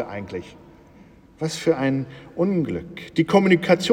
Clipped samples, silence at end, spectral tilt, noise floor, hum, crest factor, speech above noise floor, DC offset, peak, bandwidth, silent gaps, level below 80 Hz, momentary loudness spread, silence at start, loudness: under 0.1%; 0 s; -6 dB/octave; -49 dBFS; none; 18 dB; 28 dB; under 0.1%; -4 dBFS; 15.5 kHz; none; -56 dBFS; 15 LU; 0 s; -22 LUFS